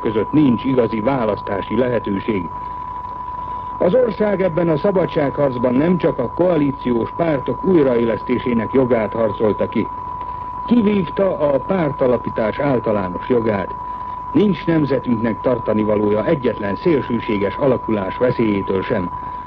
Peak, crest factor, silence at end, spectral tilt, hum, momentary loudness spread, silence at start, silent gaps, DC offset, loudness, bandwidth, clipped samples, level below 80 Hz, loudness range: -4 dBFS; 14 dB; 0 s; -10 dB/octave; none; 10 LU; 0 s; none; under 0.1%; -18 LUFS; 5.6 kHz; under 0.1%; -42 dBFS; 2 LU